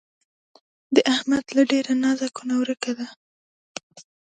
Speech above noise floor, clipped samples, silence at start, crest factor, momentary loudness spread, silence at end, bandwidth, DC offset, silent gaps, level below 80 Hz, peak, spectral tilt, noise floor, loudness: over 68 dB; under 0.1%; 0.9 s; 22 dB; 19 LU; 0.25 s; 9.2 kHz; under 0.1%; 3.16-3.75 s, 3.83-3.90 s; -68 dBFS; -2 dBFS; -3 dB/octave; under -90 dBFS; -22 LUFS